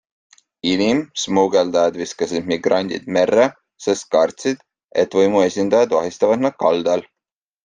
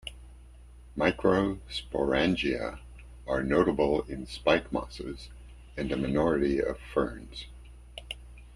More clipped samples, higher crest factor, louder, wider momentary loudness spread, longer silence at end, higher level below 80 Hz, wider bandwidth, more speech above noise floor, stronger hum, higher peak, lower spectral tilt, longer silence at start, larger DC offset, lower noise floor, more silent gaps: neither; second, 16 dB vs 22 dB; first, -18 LUFS vs -29 LUFS; second, 8 LU vs 18 LU; first, 0.65 s vs 0 s; second, -60 dBFS vs -46 dBFS; second, 9.8 kHz vs 12.5 kHz; first, 68 dB vs 22 dB; neither; first, -2 dBFS vs -8 dBFS; second, -4.5 dB/octave vs -6.5 dB/octave; first, 0.65 s vs 0.05 s; neither; first, -86 dBFS vs -50 dBFS; first, 4.84-4.88 s vs none